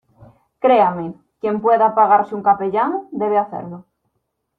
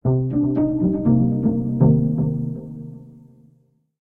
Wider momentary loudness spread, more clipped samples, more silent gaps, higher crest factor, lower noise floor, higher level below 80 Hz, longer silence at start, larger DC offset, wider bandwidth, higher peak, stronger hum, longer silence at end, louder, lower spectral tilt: about the same, 14 LU vs 16 LU; neither; neither; about the same, 16 dB vs 16 dB; first, -73 dBFS vs -60 dBFS; second, -64 dBFS vs -42 dBFS; first, 0.65 s vs 0.05 s; neither; first, 4.7 kHz vs 2 kHz; about the same, -2 dBFS vs -4 dBFS; neither; second, 0.75 s vs 0.9 s; first, -17 LUFS vs -20 LUFS; second, -9 dB/octave vs -14 dB/octave